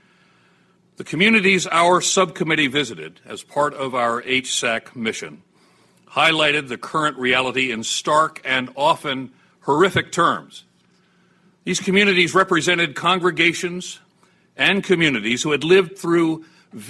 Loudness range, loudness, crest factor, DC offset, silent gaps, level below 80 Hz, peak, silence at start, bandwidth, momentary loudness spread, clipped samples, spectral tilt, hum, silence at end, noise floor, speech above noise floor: 4 LU; -18 LUFS; 18 dB; under 0.1%; none; -60 dBFS; -4 dBFS; 1 s; 12.5 kHz; 14 LU; under 0.1%; -3.5 dB/octave; none; 0 s; -59 dBFS; 40 dB